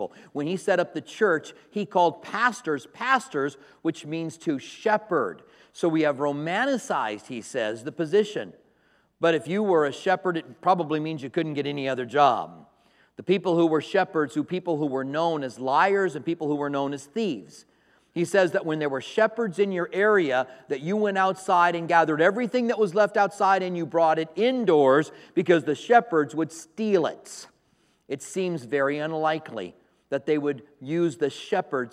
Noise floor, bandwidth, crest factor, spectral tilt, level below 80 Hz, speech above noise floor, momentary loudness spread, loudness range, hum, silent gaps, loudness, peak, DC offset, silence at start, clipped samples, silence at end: -66 dBFS; 13 kHz; 22 dB; -5.5 dB/octave; -78 dBFS; 41 dB; 11 LU; 5 LU; none; none; -25 LUFS; -4 dBFS; under 0.1%; 0 s; under 0.1%; 0.05 s